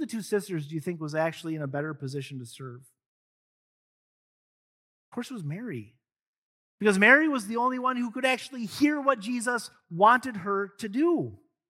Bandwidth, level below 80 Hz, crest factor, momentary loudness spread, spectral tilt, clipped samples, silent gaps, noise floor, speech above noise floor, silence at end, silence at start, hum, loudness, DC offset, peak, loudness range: 15.5 kHz; -76 dBFS; 22 dB; 18 LU; -5 dB/octave; under 0.1%; 3.06-5.12 s, 6.27-6.78 s; under -90 dBFS; over 63 dB; 0.35 s; 0 s; none; -26 LUFS; under 0.1%; -6 dBFS; 18 LU